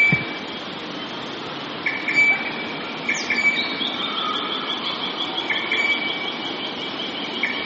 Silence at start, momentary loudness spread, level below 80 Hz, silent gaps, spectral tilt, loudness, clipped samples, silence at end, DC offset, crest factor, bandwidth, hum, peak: 0 s; 12 LU; -62 dBFS; none; -0.5 dB/octave; -22 LUFS; under 0.1%; 0 s; under 0.1%; 18 dB; 7.6 kHz; none; -6 dBFS